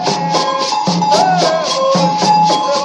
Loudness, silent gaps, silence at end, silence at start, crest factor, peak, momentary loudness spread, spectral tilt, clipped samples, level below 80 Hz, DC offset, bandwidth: -13 LUFS; none; 0 s; 0 s; 12 dB; -2 dBFS; 4 LU; -4 dB/octave; under 0.1%; -58 dBFS; under 0.1%; 11.5 kHz